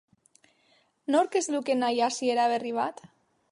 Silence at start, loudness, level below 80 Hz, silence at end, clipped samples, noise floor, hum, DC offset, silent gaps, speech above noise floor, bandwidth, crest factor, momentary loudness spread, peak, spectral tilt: 1.1 s; -27 LUFS; -82 dBFS; 0.45 s; under 0.1%; -67 dBFS; none; under 0.1%; none; 40 dB; 11.5 kHz; 18 dB; 6 LU; -12 dBFS; -2.5 dB/octave